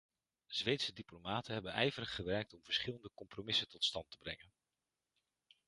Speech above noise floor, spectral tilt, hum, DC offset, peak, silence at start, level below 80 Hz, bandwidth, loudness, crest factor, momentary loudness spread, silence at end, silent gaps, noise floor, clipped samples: over 49 dB; -4 dB/octave; none; under 0.1%; -18 dBFS; 0.5 s; -68 dBFS; 11.5 kHz; -40 LUFS; 24 dB; 13 LU; 1.3 s; none; under -90 dBFS; under 0.1%